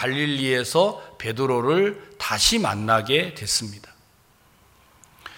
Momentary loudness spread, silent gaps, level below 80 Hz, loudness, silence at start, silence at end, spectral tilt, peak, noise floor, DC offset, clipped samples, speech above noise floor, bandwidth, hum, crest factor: 10 LU; none; -48 dBFS; -22 LUFS; 0 s; 0 s; -3.5 dB/octave; -4 dBFS; -58 dBFS; under 0.1%; under 0.1%; 35 dB; 17 kHz; none; 20 dB